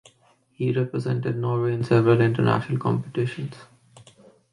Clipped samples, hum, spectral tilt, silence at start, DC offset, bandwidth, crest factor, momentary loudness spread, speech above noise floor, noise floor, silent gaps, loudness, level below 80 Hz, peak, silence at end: under 0.1%; none; -8.5 dB/octave; 0.6 s; under 0.1%; 10.5 kHz; 16 dB; 10 LU; 39 dB; -61 dBFS; none; -23 LUFS; -60 dBFS; -8 dBFS; 0.55 s